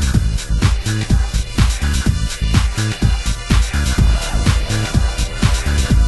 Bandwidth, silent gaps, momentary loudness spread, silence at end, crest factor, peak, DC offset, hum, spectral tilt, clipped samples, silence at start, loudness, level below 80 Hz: 12.5 kHz; none; 3 LU; 0 s; 14 dB; 0 dBFS; under 0.1%; none; -4.5 dB/octave; under 0.1%; 0 s; -17 LUFS; -18 dBFS